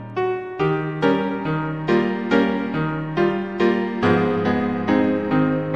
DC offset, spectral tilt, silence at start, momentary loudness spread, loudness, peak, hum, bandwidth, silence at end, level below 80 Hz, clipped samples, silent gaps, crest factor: 0.3%; -8 dB/octave; 0 s; 5 LU; -21 LUFS; -2 dBFS; none; 7.8 kHz; 0 s; -50 dBFS; under 0.1%; none; 18 dB